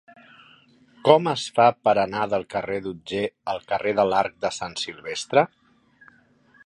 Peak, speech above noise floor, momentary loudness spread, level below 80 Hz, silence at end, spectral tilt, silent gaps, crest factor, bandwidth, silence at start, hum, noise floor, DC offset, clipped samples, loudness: -2 dBFS; 36 dB; 11 LU; -62 dBFS; 1.2 s; -4.5 dB/octave; none; 24 dB; 11 kHz; 1.05 s; none; -58 dBFS; under 0.1%; under 0.1%; -23 LUFS